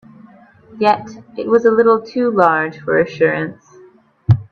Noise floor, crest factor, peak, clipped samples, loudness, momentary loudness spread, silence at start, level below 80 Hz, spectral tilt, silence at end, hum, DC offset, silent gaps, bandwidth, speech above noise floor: -47 dBFS; 16 dB; 0 dBFS; under 0.1%; -16 LUFS; 13 LU; 0.7 s; -50 dBFS; -8 dB/octave; 0.1 s; none; under 0.1%; none; 6.6 kHz; 32 dB